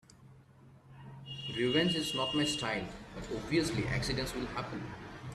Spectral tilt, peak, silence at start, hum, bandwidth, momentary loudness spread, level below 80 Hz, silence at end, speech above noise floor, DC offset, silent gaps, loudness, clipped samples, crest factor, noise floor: -4.5 dB/octave; -16 dBFS; 0.2 s; none; 13.5 kHz; 16 LU; -54 dBFS; 0 s; 25 dB; under 0.1%; none; -34 LUFS; under 0.1%; 20 dB; -58 dBFS